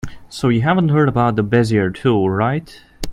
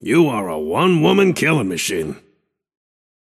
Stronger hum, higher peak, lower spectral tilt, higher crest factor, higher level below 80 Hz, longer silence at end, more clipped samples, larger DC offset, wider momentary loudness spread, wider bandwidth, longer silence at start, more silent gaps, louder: neither; about the same, 0 dBFS vs 0 dBFS; first, -7.5 dB/octave vs -5.5 dB/octave; about the same, 16 dB vs 18 dB; first, -40 dBFS vs -54 dBFS; second, 0 s vs 1.05 s; neither; neither; second, 8 LU vs 11 LU; about the same, 15.5 kHz vs 15 kHz; about the same, 0.05 s vs 0 s; neither; about the same, -16 LUFS vs -17 LUFS